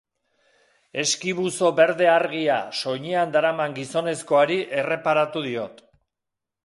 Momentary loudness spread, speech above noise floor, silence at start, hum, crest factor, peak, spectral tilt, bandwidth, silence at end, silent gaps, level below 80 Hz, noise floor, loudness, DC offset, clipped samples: 9 LU; 62 dB; 0.95 s; none; 18 dB; -4 dBFS; -3.5 dB/octave; 11.5 kHz; 0.9 s; none; -72 dBFS; -84 dBFS; -22 LUFS; under 0.1%; under 0.1%